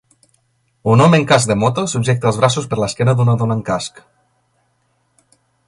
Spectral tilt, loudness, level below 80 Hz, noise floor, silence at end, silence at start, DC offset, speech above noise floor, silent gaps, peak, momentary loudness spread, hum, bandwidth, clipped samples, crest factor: -5.5 dB/octave; -15 LUFS; -48 dBFS; -63 dBFS; 1.8 s; 0.85 s; under 0.1%; 49 dB; none; 0 dBFS; 11 LU; none; 11.5 kHz; under 0.1%; 16 dB